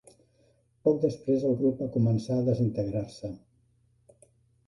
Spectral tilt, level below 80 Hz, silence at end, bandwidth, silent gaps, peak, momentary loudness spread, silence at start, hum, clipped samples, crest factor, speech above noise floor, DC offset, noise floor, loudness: -9.5 dB/octave; -58 dBFS; 1.3 s; 11.5 kHz; none; -12 dBFS; 13 LU; 0.85 s; none; under 0.1%; 18 dB; 40 dB; under 0.1%; -67 dBFS; -28 LUFS